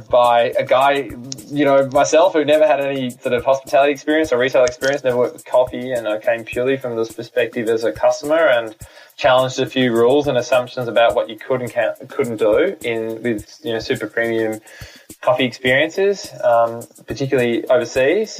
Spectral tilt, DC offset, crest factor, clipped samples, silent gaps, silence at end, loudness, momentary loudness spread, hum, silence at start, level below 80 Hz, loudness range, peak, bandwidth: -4.5 dB/octave; under 0.1%; 14 dB; under 0.1%; none; 0 s; -17 LUFS; 9 LU; none; 0 s; -52 dBFS; 4 LU; -4 dBFS; 15.5 kHz